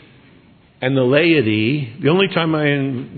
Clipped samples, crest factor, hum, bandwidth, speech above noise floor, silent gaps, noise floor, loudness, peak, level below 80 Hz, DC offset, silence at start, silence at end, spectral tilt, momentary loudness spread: under 0.1%; 16 dB; none; 4.5 kHz; 33 dB; none; -49 dBFS; -16 LUFS; 0 dBFS; -60 dBFS; under 0.1%; 0.8 s; 0 s; -10.5 dB/octave; 7 LU